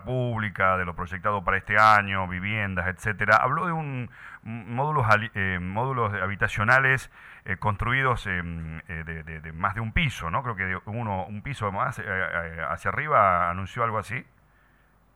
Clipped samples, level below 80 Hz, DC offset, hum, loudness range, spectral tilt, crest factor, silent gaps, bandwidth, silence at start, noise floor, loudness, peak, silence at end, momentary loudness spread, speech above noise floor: under 0.1%; -46 dBFS; under 0.1%; none; 6 LU; -6 dB/octave; 20 dB; none; 14.5 kHz; 0 s; -61 dBFS; -25 LUFS; -6 dBFS; 0.95 s; 15 LU; 35 dB